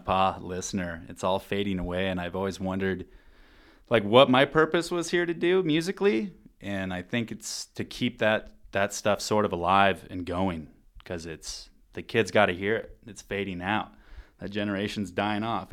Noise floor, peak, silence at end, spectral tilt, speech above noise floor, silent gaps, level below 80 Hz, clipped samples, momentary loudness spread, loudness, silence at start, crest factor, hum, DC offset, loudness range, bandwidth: -55 dBFS; -2 dBFS; 0.05 s; -5 dB/octave; 28 dB; none; -54 dBFS; under 0.1%; 15 LU; -27 LUFS; 0.05 s; 24 dB; none; under 0.1%; 6 LU; 16 kHz